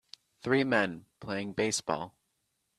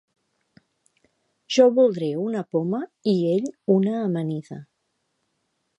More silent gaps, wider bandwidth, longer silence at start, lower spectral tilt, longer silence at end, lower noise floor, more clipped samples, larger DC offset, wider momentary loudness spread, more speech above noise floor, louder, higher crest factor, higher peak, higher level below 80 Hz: neither; first, 13 kHz vs 10 kHz; second, 0.45 s vs 1.5 s; second, -4 dB/octave vs -7 dB/octave; second, 0.7 s vs 1.15 s; first, -79 dBFS vs -74 dBFS; neither; neither; first, 15 LU vs 12 LU; second, 48 dB vs 53 dB; second, -31 LUFS vs -22 LUFS; about the same, 22 dB vs 20 dB; second, -12 dBFS vs -4 dBFS; first, -68 dBFS vs -76 dBFS